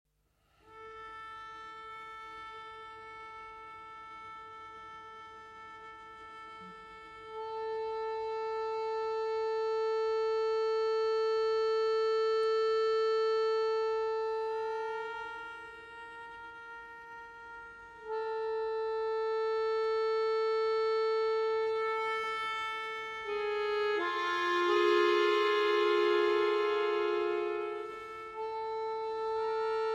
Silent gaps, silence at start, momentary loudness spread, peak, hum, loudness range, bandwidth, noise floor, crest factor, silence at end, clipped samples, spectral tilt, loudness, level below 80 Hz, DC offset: none; 0.7 s; 19 LU; -18 dBFS; none; 18 LU; 8 kHz; -73 dBFS; 16 dB; 0 s; under 0.1%; -3.5 dB/octave; -32 LUFS; -72 dBFS; under 0.1%